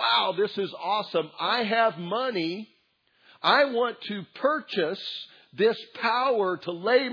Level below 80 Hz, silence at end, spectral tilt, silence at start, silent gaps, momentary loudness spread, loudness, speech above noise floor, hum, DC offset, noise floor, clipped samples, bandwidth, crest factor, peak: -88 dBFS; 0 s; -6 dB/octave; 0 s; none; 11 LU; -26 LUFS; 41 dB; none; under 0.1%; -68 dBFS; under 0.1%; 5.4 kHz; 20 dB; -6 dBFS